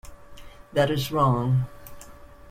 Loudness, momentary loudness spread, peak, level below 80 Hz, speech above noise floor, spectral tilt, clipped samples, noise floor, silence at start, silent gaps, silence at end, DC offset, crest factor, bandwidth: -24 LUFS; 19 LU; -10 dBFS; -48 dBFS; 23 dB; -6.5 dB/octave; under 0.1%; -45 dBFS; 0.05 s; none; 0 s; under 0.1%; 16 dB; 16 kHz